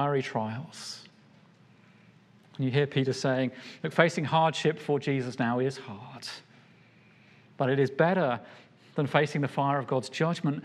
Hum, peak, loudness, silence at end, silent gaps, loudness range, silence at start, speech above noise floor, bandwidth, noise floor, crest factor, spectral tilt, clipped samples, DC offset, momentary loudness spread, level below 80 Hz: none; -4 dBFS; -28 LUFS; 0 s; none; 5 LU; 0 s; 30 dB; 12 kHz; -58 dBFS; 24 dB; -6 dB/octave; under 0.1%; under 0.1%; 16 LU; -80 dBFS